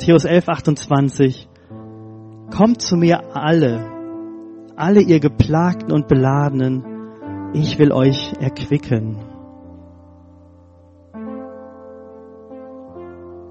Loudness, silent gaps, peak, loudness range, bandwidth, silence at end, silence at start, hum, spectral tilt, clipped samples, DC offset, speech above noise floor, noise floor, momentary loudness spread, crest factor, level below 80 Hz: -16 LUFS; none; 0 dBFS; 20 LU; 8.4 kHz; 0 s; 0 s; none; -7 dB/octave; under 0.1%; under 0.1%; 31 dB; -47 dBFS; 24 LU; 18 dB; -44 dBFS